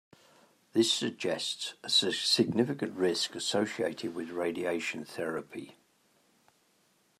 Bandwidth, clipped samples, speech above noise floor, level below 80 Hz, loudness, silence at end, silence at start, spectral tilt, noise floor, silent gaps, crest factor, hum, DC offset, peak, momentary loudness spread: 14 kHz; under 0.1%; 38 dB; -80 dBFS; -30 LUFS; 1.5 s; 0.75 s; -3.5 dB/octave; -70 dBFS; none; 20 dB; none; under 0.1%; -12 dBFS; 11 LU